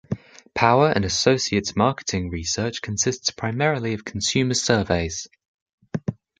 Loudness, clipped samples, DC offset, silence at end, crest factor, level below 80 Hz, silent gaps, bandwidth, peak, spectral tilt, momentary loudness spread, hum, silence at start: -22 LUFS; under 0.1%; under 0.1%; 0.25 s; 22 dB; -44 dBFS; 5.45-5.66 s, 5.73-5.78 s; 9.6 kHz; -2 dBFS; -4 dB/octave; 12 LU; none; 0.1 s